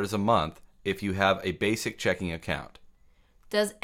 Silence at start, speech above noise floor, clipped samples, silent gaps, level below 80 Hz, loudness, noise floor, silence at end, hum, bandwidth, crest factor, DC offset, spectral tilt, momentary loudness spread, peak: 0 s; 32 dB; under 0.1%; none; -52 dBFS; -28 LUFS; -60 dBFS; 0.1 s; none; 16.5 kHz; 20 dB; under 0.1%; -5 dB/octave; 10 LU; -8 dBFS